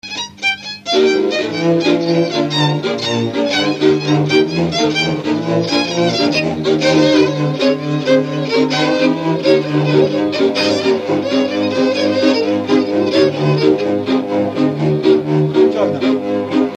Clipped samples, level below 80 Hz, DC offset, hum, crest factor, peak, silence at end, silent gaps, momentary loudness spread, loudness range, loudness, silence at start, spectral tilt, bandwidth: under 0.1%; -54 dBFS; under 0.1%; none; 14 dB; 0 dBFS; 0 s; none; 4 LU; 1 LU; -15 LUFS; 0.05 s; -5.5 dB/octave; 9.2 kHz